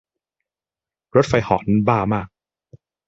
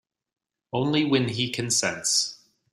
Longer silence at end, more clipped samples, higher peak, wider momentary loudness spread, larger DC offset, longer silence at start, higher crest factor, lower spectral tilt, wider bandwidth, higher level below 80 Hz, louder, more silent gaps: first, 0.8 s vs 0.4 s; neither; first, 0 dBFS vs -8 dBFS; about the same, 7 LU vs 7 LU; neither; first, 1.15 s vs 0.75 s; about the same, 20 dB vs 18 dB; first, -7.5 dB/octave vs -3 dB/octave; second, 8 kHz vs 15.5 kHz; first, -46 dBFS vs -64 dBFS; first, -19 LUFS vs -24 LUFS; neither